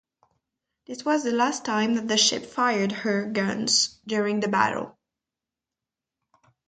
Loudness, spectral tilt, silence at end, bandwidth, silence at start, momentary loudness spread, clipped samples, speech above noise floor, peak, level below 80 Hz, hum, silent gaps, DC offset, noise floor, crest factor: -24 LUFS; -2.5 dB/octave; 1.8 s; 9.4 kHz; 0.9 s; 7 LU; under 0.1%; 64 dB; -6 dBFS; -70 dBFS; none; none; under 0.1%; -89 dBFS; 22 dB